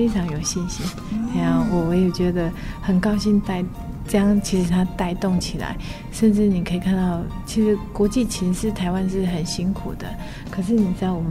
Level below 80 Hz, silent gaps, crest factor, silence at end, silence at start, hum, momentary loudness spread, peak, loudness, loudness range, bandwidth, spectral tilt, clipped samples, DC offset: -34 dBFS; none; 14 dB; 0 s; 0 s; none; 10 LU; -6 dBFS; -22 LUFS; 2 LU; 15 kHz; -6 dB/octave; under 0.1%; under 0.1%